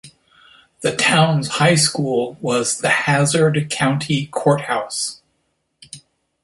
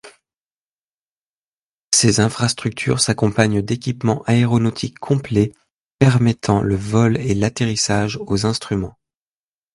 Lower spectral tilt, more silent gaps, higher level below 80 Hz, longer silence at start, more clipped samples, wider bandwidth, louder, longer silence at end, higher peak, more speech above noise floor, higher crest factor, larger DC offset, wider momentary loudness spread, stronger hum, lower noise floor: about the same, -4 dB/octave vs -5 dB/octave; second, none vs 0.41-1.91 s, 5.74-5.98 s; second, -58 dBFS vs -44 dBFS; about the same, 0.05 s vs 0.05 s; neither; about the same, 12 kHz vs 11.5 kHz; about the same, -17 LUFS vs -18 LUFS; second, 0.45 s vs 0.85 s; about the same, -2 dBFS vs 0 dBFS; second, 52 dB vs over 73 dB; about the same, 18 dB vs 18 dB; neither; first, 10 LU vs 7 LU; neither; second, -69 dBFS vs under -90 dBFS